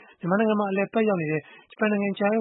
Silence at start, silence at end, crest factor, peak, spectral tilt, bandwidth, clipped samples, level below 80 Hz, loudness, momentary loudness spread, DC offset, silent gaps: 0.25 s; 0 s; 16 dB; -8 dBFS; -11.5 dB/octave; 4.1 kHz; under 0.1%; -74 dBFS; -25 LUFS; 5 LU; under 0.1%; none